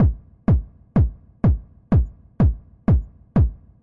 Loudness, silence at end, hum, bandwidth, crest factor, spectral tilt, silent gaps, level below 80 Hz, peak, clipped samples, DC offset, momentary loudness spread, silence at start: -22 LUFS; 0.3 s; none; 3.2 kHz; 12 dB; -12 dB/octave; none; -26 dBFS; -8 dBFS; under 0.1%; under 0.1%; 5 LU; 0 s